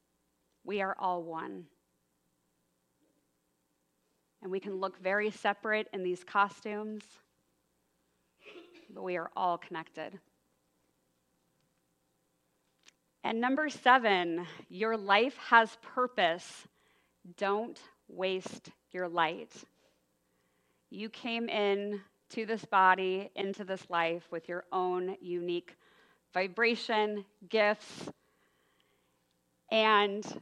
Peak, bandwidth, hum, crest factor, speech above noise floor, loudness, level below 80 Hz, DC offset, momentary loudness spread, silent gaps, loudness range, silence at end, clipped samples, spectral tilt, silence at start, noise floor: -8 dBFS; 11.5 kHz; none; 26 dB; 46 dB; -32 LUFS; -86 dBFS; under 0.1%; 20 LU; none; 11 LU; 0 s; under 0.1%; -4.5 dB/octave; 0.65 s; -78 dBFS